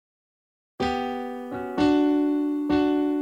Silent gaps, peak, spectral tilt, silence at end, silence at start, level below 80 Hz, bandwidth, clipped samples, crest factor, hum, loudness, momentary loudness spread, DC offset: none; -10 dBFS; -6.5 dB/octave; 0 s; 0.8 s; -52 dBFS; 8 kHz; under 0.1%; 16 dB; none; -24 LUFS; 11 LU; under 0.1%